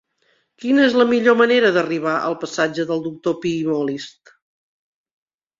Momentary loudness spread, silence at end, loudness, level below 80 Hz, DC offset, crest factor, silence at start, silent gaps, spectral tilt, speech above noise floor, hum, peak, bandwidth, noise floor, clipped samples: 10 LU; 1.5 s; -18 LUFS; -64 dBFS; under 0.1%; 18 dB; 0.6 s; none; -5 dB/octave; 46 dB; none; -2 dBFS; 7.6 kHz; -64 dBFS; under 0.1%